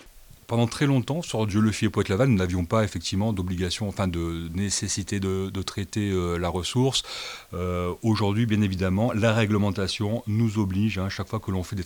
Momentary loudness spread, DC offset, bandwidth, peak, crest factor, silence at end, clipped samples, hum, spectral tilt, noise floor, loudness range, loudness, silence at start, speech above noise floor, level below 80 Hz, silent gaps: 7 LU; under 0.1%; 19.5 kHz; -8 dBFS; 18 dB; 0 s; under 0.1%; none; -5.5 dB/octave; -48 dBFS; 3 LU; -25 LUFS; 0.05 s; 23 dB; -48 dBFS; none